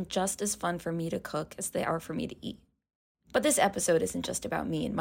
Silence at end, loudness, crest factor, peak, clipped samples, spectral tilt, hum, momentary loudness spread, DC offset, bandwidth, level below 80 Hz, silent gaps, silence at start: 0 s; -31 LUFS; 20 dB; -12 dBFS; under 0.1%; -3.5 dB/octave; none; 11 LU; under 0.1%; 16.5 kHz; -60 dBFS; 2.95-3.15 s; 0 s